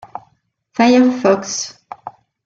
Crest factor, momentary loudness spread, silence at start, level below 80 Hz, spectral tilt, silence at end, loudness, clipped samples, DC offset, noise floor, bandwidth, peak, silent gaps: 16 dB; 24 LU; 0.15 s; -60 dBFS; -4 dB/octave; 0.35 s; -14 LUFS; under 0.1%; under 0.1%; -61 dBFS; 7.8 kHz; -2 dBFS; none